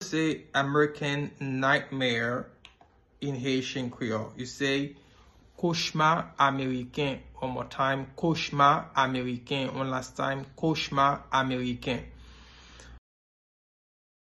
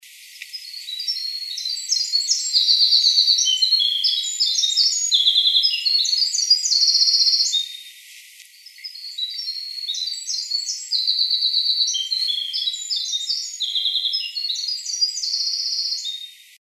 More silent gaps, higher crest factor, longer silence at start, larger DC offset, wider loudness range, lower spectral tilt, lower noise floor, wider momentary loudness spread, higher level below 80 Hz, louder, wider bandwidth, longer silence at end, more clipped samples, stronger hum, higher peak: neither; about the same, 22 dB vs 18 dB; about the same, 0 s vs 0.05 s; neither; about the same, 5 LU vs 7 LU; first, -5 dB/octave vs 14.5 dB/octave; first, -61 dBFS vs -45 dBFS; second, 9 LU vs 13 LU; first, -56 dBFS vs under -90 dBFS; second, -28 LUFS vs -18 LUFS; second, 12 kHz vs 13.5 kHz; first, 1.3 s vs 0.25 s; neither; neither; second, -8 dBFS vs -4 dBFS